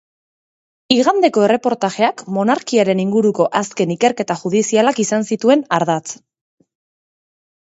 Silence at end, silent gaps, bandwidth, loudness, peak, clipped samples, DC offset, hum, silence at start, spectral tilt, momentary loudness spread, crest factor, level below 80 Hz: 1.5 s; none; 8.2 kHz; -16 LUFS; 0 dBFS; under 0.1%; under 0.1%; none; 0.9 s; -4.5 dB/octave; 6 LU; 16 dB; -64 dBFS